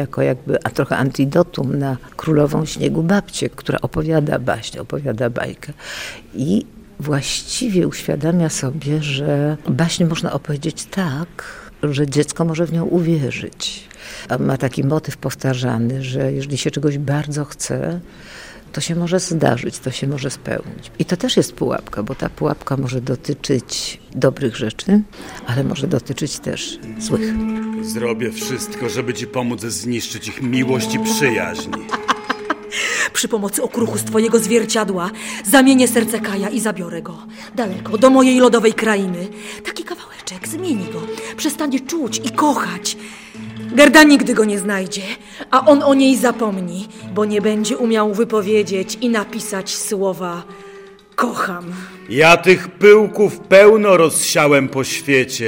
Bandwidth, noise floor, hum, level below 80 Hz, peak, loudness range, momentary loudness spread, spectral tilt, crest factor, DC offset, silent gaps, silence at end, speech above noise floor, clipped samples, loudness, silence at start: 16.5 kHz; -39 dBFS; none; -46 dBFS; 0 dBFS; 8 LU; 15 LU; -5 dB/octave; 18 dB; under 0.1%; none; 0 s; 22 dB; under 0.1%; -17 LUFS; 0 s